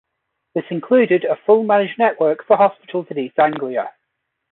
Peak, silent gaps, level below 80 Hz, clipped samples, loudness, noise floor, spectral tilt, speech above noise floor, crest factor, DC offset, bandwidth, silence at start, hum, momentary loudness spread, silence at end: -2 dBFS; none; -68 dBFS; under 0.1%; -17 LUFS; -75 dBFS; -11 dB/octave; 58 dB; 16 dB; under 0.1%; 4.1 kHz; 0.55 s; none; 12 LU; 0.65 s